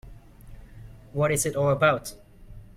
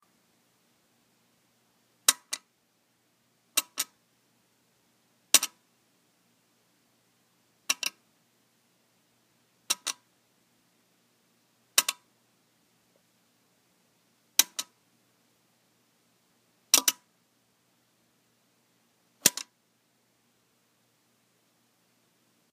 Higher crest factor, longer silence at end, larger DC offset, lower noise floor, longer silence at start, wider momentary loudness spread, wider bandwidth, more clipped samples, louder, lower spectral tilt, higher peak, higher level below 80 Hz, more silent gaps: second, 20 dB vs 36 dB; second, 0.1 s vs 3.1 s; neither; second, -46 dBFS vs -71 dBFS; second, 0.05 s vs 2.1 s; second, 14 LU vs 20 LU; about the same, 16 kHz vs 15.5 kHz; neither; first, -24 LUFS vs -27 LUFS; first, -4.5 dB/octave vs 1.5 dB/octave; second, -8 dBFS vs 0 dBFS; first, -48 dBFS vs -88 dBFS; neither